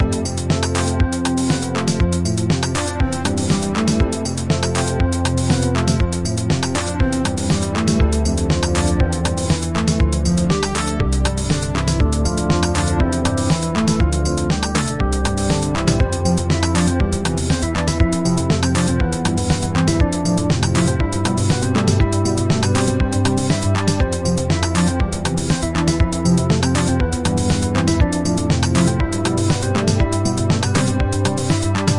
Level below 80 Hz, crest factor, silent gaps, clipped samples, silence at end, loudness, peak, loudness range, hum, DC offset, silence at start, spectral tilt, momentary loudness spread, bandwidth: -26 dBFS; 16 dB; none; under 0.1%; 0 s; -18 LUFS; -2 dBFS; 1 LU; none; 1%; 0 s; -5.5 dB/octave; 3 LU; 11.5 kHz